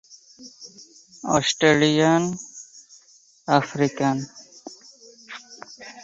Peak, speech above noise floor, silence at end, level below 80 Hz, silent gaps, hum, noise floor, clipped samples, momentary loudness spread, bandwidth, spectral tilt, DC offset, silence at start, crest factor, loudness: -2 dBFS; 34 dB; 0 s; -62 dBFS; none; none; -55 dBFS; under 0.1%; 24 LU; 8 kHz; -4.5 dB/octave; under 0.1%; 0.4 s; 22 dB; -21 LUFS